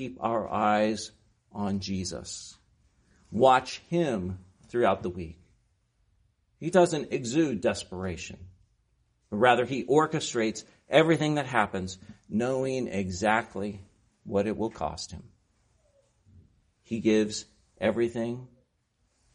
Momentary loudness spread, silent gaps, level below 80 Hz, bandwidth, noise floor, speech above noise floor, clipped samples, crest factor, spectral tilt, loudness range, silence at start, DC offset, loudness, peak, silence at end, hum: 17 LU; none; -58 dBFS; 10.5 kHz; -73 dBFS; 46 dB; under 0.1%; 22 dB; -5 dB/octave; 6 LU; 0 s; under 0.1%; -28 LUFS; -6 dBFS; 0.9 s; none